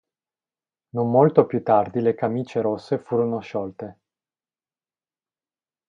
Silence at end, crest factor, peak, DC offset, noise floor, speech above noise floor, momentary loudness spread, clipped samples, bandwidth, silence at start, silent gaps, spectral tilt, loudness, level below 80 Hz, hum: 1.95 s; 24 dB; 0 dBFS; under 0.1%; under -90 dBFS; over 69 dB; 15 LU; under 0.1%; 7.2 kHz; 0.95 s; none; -9.5 dB/octave; -22 LUFS; -64 dBFS; none